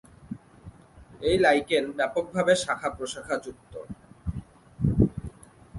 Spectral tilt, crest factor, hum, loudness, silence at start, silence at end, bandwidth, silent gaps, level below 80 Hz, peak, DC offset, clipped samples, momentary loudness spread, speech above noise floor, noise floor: -5.5 dB/octave; 20 dB; none; -26 LUFS; 0.25 s; 0 s; 11.5 kHz; none; -44 dBFS; -8 dBFS; under 0.1%; under 0.1%; 21 LU; 26 dB; -51 dBFS